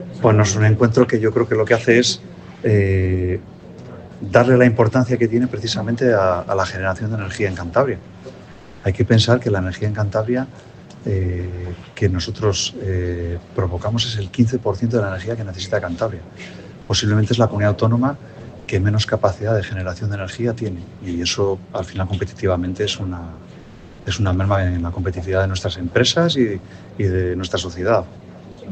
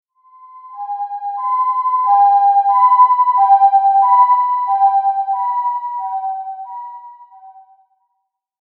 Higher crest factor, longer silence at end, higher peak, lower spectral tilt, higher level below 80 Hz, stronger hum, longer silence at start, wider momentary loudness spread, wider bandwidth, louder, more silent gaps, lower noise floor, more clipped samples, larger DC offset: about the same, 18 dB vs 14 dB; second, 0 s vs 1.1 s; about the same, 0 dBFS vs -2 dBFS; first, -5.5 dB/octave vs 5 dB/octave; first, -42 dBFS vs under -90 dBFS; neither; second, 0 s vs 0.55 s; about the same, 17 LU vs 16 LU; first, 8.6 kHz vs 4.2 kHz; second, -19 LUFS vs -14 LUFS; neither; second, -40 dBFS vs -72 dBFS; neither; neither